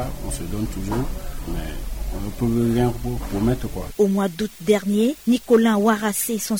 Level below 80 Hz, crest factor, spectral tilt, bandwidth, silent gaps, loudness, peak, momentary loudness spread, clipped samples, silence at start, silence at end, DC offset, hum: -32 dBFS; 16 dB; -5.5 dB/octave; over 20 kHz; none; -22 LUFS; -6 dBFS; 13 LU; under 0.1%; 0 s; 0 s; 0.3%; none